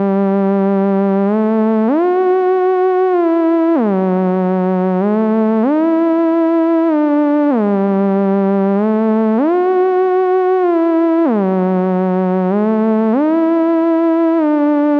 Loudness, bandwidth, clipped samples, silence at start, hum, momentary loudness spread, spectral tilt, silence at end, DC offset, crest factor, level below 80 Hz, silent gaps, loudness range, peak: -14 LUFS; 4.9 kHz; under 0.1%; 0 s; none; 2 LU; -10.5 dB/octave; 0 s; under 0.1%; 10 dB; -80 dBFS; none; 0 LU; -4 dBFS